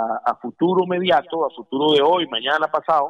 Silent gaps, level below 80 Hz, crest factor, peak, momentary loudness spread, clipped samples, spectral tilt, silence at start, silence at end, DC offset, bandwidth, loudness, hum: none; -68 dBFS; 12 dB; -6 dBFS; 8 LU; under 0.1%; -6.5 dB/octave; 0 s; 0 s; under 0.1%; 8.4 kHz; -19 LUFS; none